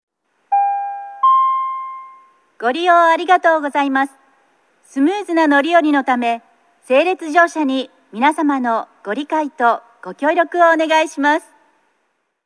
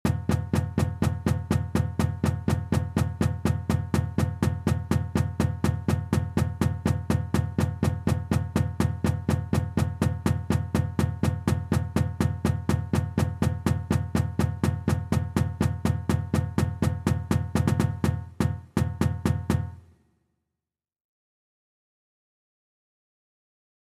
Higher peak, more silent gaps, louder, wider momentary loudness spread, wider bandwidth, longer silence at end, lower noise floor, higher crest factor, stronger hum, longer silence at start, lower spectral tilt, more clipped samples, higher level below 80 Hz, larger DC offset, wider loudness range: first, 0 dBFS vs -10 dBFS; neither; first, -16 LUFS vs -27 LUFS; first, 11 LU vs 2 LU; second, 11 kHz vs 15.5 kHz; second, 1.05 s vs 4.15 s; second, -68 dBFS vs -88 dBFS; about the same, 16 dB vs 16 dB; neither; first, 0.5 s vs 0.05 s; second, -3.5 dB/octave vs -7 dB/octave; neither; second, -84 dBFS vs -40 dBFS; neither; about the same, 2 LU vs 2 LU